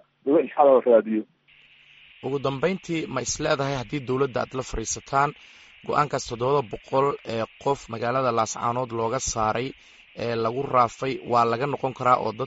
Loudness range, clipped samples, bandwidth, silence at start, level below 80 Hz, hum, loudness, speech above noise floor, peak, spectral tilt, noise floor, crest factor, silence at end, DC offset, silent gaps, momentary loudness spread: 3 LU; under 0.1%; 8 kHz; 0.25 s; -50 dBFS; none; -24 LUFS; 32 dB; -4 dBFS; -5 dB/octave; -56 dBFS; 20 dB; 0 s; under 0.1%; none; 10 LU